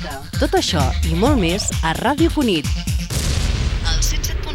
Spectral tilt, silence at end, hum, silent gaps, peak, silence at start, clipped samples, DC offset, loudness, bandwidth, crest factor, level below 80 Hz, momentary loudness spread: -4.5 dB/octave; 0 s; none; none; -4 dBFS; 0 s; under 0.1%; under 0.1%; -19 LUFS; 17 kHz; 14 dB; -22 dBFS; 6 LU